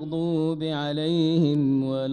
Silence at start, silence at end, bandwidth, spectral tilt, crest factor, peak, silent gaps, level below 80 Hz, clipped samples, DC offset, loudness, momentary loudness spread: 0 s; 0 s; 9.4 kHz; -8 dB/octave; 12 dB; -12 dBFS; none; -62 dBFS; under 0.1%; under 0.1%; -24 LUFS; 5 LU